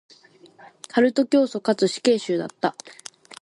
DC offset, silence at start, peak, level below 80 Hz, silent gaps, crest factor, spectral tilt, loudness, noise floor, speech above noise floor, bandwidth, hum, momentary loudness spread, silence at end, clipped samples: under 0.1%; 0.95 s; -6 dBFS; -72 dBFS; none; 18 dB; -4.5 dB/octave; -22 LUFS; -52 dBFS; 30 dB; 11.5 kHz; none; 21 LU; 0.5 s; under 0.1%